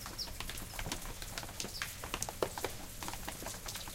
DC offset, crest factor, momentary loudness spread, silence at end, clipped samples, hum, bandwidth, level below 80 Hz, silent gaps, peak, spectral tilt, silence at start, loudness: under 0.1%; 28 dB; 5 LU; 0 s; under 0.1%; none; 17 kHz; -50 dBFS; none; -14 dBFS; -2.5 dB/octave; 0 s; -41 LUFS